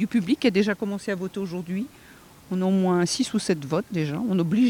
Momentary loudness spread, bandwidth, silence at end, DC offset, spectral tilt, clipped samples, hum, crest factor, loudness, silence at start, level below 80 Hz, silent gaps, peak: 10 LU; 17.5 kHz; 0 s; under 0.1%; -5.5 dB/octave; under 0.1%; none; 16 dB; -25 LUFS; 0 s; -62 dBFS; none; -8 dBFS